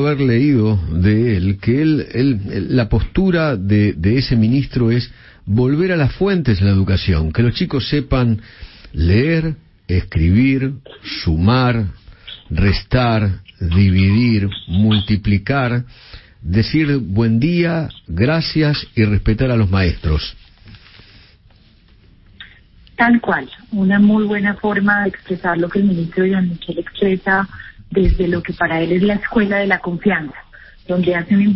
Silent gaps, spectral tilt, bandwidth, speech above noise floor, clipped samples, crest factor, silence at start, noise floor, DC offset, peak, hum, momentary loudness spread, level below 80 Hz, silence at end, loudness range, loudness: none; -11 dB/octave; 5.8 kHz; 33 dB; under 0.1%; 14 dB; 0 s; -49 dBFS; under 0.1%; -2 dBFS; none; 8 LU; -30 dBFS; 0 s; 2 LU; -16 LUFS